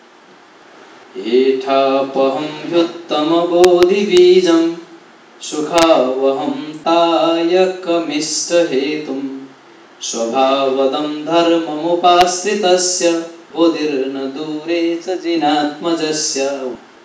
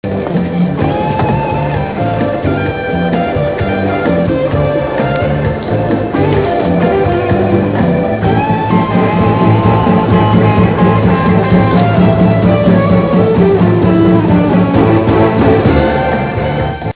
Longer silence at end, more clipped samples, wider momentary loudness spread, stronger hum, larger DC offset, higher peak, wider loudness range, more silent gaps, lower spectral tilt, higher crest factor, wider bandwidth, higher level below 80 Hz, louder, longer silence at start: first, 0.25 s vs 0.1 s; second, under 0.1% vs 0.2%; first, 12 LU vs 6 LU; neither; second, under 0.1% vs 0.4%; about the same, 0 dBFS vs 0 dBFS; about the same, 5 LU vs 5 LU; neither; second, -3.5 dB/octave vs -12 dB/octave; first, 16 dB vs 10 dB; first, 8 kHz vs 4 kHz; second, -56 dBFS vs -28 dBFS; second, -15 LUFS vs -11 LUFS; first, 1.15 s vs 0.05 s